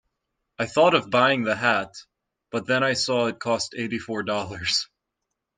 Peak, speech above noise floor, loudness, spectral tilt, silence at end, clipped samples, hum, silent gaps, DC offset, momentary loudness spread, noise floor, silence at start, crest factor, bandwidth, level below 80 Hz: -4 dBFS; 59 dB; -23 LUFS; -3.5 dB/octave; 0.75 s; under 0.1%; none; none; under 0.1%; 12 LU; -82 dBFS; 0.6 s; 20 dB; 10 kHz; -64 dBFS